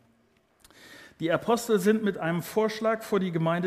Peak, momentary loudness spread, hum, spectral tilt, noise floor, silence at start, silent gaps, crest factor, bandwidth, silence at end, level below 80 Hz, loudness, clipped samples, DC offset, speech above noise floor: -10 dBFS; 5 LU; none; -6 dB/octave; -66 dBFS; 0.85 s; none; 18 dB; 15.5 kHz; 0 s; -68 dBFS; -27 LUFS; under 0.1%; under 0.1%; 40 dB